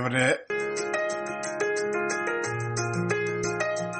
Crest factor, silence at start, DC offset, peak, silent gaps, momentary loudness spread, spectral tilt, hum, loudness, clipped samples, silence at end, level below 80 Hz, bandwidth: 18 dB; 0 s; under 0.1%; -8 dBFS; none; 5 LU; -4.5 dB/octave; none; -28 LUFS; under 0.1%; 0 s; -64 dBFS; 8.8 kHz